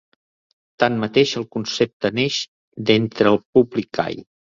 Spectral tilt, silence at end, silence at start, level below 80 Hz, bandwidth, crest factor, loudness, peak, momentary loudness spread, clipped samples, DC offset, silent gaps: -5 dB/octave; 0.3 s; 0.8 s; -58 dBFS; 7.6 kHz; 18 dB; -20 LUFS; -2 dBFS; 9 LU; under 0.1%; under 0.1%; 1.93-2.00 s, 2.48-2.72 s, 3.45-3.53 s